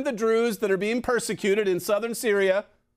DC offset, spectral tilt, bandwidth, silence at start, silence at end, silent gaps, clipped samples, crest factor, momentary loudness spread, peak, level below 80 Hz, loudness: under 0.1%; -4 dB/octave; 16 kHz; 0 s; 0.35 s; none; under 0.1%; 14 dB; 3 LU; -10 dBFS; -60 dBFS; -24 LUFS